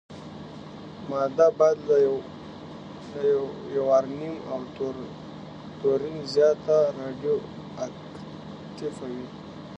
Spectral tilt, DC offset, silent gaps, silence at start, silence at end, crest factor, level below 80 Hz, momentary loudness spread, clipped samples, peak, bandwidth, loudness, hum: -6.5 dB/octave; under 0.1%; none; 0.1 s; 0 s; 20 dB; -60 dBFS; 19 LU; under 0.1%; -6 dBFS; 8.4 kHz; -25 LUFS; none